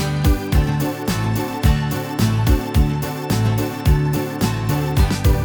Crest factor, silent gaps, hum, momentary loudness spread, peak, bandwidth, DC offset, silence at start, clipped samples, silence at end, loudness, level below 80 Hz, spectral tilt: 14 dB; none; none; 4 LU; -4 dBFS; over 20 kHz; under 0.1%; 0 s; under 0.1%; 0 s; -19 LUFS; -22 dBFS; -6 dB/octave